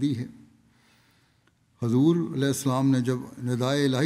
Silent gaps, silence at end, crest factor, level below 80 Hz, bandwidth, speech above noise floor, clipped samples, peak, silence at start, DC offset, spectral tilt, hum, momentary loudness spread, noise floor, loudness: none; 0 s; 16 dB; -68 dBFS; 15.5 kHz; 41 dB; under 0.1%; -10 dBFS; 0 s; under 0.1%; -6.5 dB/octave; none; 10 LU; -65 dBFS; -25 LUFS